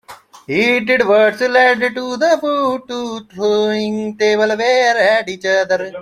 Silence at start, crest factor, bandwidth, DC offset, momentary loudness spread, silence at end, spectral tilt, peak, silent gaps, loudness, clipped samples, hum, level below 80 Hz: 0.1 s; 14 dB; 14.5 kHz; under 0.1%; 9 LU; 0 s; -4 dB/octave; -2 dBFS; none; -15 LUFS; under 0.1%; none; -60 dBFS